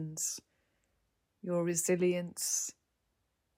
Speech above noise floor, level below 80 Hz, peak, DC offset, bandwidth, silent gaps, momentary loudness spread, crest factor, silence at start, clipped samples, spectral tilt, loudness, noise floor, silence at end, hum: 47 dB; -80 dBFS; -18 dBFS; under 0.1%; 16 kHz; none; 11 LU; 18 dB; 0 s; under 0.1%; -4 dB/octave; -33 LUFS; -80 dBFS; 0.85 s; none